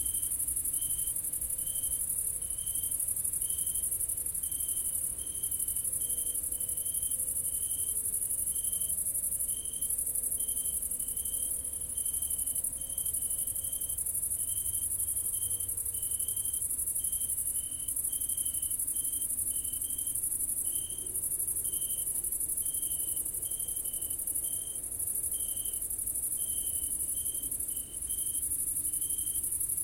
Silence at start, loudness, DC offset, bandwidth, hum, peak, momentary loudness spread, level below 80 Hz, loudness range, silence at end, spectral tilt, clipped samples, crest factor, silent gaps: 0 s; -30 LUFS; under 0.1%; 16.5 kHz; none; -16 dBFS; 2 LU; -54 dBFS; 1 LU; 0 s; -0.5 dB/octave; under 0.1%; 18 dB; none